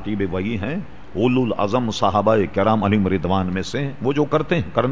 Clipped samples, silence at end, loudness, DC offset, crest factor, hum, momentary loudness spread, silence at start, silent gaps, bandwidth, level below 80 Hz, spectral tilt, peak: under 0.1%; 0 s; -20 LUFS; 2%; 18 dB; none; 7 LU; 0 s; none; 8 kHz; -40 dBFS; -7 dB/octave; -2 dBFS